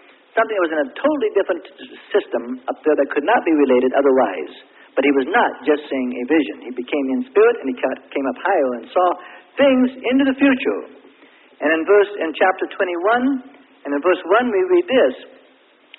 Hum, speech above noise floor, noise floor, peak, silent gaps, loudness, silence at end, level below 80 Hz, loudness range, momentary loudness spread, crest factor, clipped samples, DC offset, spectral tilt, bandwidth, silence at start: none; 35 dB; -53 dBFS; -2 dBFS; none; -18 LUFS; 0.75 s; -66 dBFS; 2 LU; 11 LU; 16 dB; under 0.1%; under 0.1%; -9 dB/octave; 4.1 kHz; 0.35 s